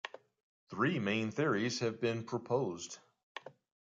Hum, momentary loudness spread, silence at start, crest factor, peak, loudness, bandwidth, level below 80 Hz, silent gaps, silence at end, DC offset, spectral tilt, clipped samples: none; 17 LU; 0.05 s; 18 dB; -18 dBFS; -35 LUFS; 9.2 kHz; -74 dBFS; 0.43-0.67 s, 3.23-3.35 s; 0.35 s; under 0.1%; -5 dB/octave; under 0.1%